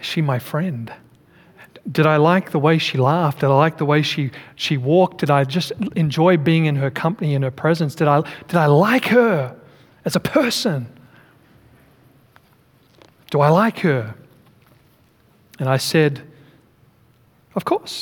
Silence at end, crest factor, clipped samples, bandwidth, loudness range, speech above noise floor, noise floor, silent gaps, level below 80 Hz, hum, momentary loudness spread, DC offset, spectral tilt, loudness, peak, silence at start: 0 s; 18 dB; under 0.1%; 18.5 kHz; 7 LU; 38 dB; -55 dBFS; none; -62 dBFS; none; 12 LU; under 0.1%; -6.5 dB/octave; -18 LUFS; -2 dBFS; 0 s